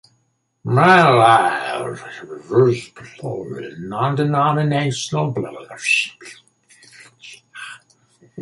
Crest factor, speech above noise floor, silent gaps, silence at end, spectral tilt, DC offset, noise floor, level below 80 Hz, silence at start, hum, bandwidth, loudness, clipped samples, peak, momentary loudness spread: 18 dB; 49 dB; none; 0 s; -5.5 dB/octave; under 0.1%; -66 dBFS; -60 dBFS; 0.65 s; none; 11.5 kHz; -17 LUFS; under 0.1%; -2 dBFS; 23 LU